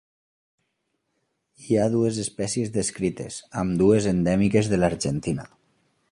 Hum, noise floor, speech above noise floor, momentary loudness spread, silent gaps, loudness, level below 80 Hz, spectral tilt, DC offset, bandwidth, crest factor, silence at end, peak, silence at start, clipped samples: none; -76 dBFS; 53 dB; 9 LU; none; -24 LUFS; -48 dBFS; -6 dB/octave; under 0.1%; 11.5 kHz; 18 dB; 0.65 s; -6 dBFS; 1.6 s; under 0.1%